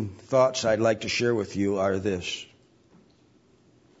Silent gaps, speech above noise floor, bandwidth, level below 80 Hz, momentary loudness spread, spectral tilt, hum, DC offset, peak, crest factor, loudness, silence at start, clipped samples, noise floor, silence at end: none; 35 dB; 8 kHz; -62 dBFS; 10 LU; -4.5 dB/octave; none; under 0.1%; -8 dBFS; 18 dB; -25 LUFS; 0 s; under 0.1%; -60 dBFS; 1.55 s